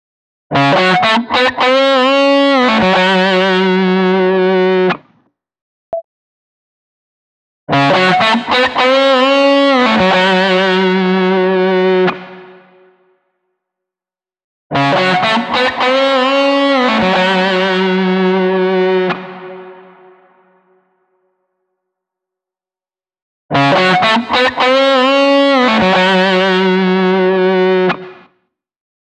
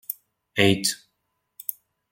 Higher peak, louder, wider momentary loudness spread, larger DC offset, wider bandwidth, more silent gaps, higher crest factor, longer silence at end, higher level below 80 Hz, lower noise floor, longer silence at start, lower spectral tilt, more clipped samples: about the same, -2 dBFS vs -2 dBFS; first, -11 LUFS vs -24 LUFS; second, 6 LU vs 16 LU; neither; second, 9.4 kHz vs 17 kHz; first, 5.61-5.92 s, 6.04-7.67 s, 14.44-14.70 s, 23.22-23.49 s vs none; second, 12 dB vs 24 dB; first, 0.9 s vs 0.4 s; first, -52 dBFS vs -62 dBFS; first, under -90 dBFS vs -76 dBFS; first, 0.5 s vs 0.1 s; first, -5.5 dB/octave vs -3.5 dB/octave; neither